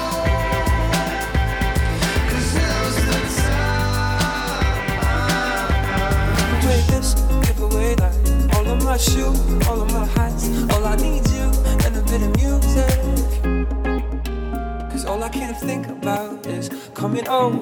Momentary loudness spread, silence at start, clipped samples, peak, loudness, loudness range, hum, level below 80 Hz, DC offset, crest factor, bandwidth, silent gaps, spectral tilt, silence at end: 7 LU; 0 s; under 0.1%; -6 dBFS; -20 LUFS; 5 LU; none; -20 dBFS; under 0.1%; 12 dB; 19.5 kHz; none; -5 dB/octave; 0 s